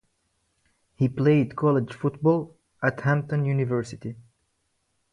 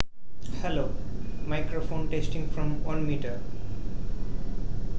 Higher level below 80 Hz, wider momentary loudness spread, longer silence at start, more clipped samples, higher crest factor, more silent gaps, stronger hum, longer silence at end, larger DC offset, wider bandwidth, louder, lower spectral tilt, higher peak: second, -62 dBFS vs -34 dBFS; first, 12 LU vs 7 LU; first, 1 s vs 0 s; neither; second, 18 dB vs 24 dB; neither; neither; first, 0.95 s vs 0 s; second, under 0.1% vs 6%; first, 9.8 kHz vs 7.8 kHz; first, -25 LUFS vs -34 LUFS; first, -8.5 dB/octave vs -7 dB/octave; second, -8 dBFS vs -4 dBFS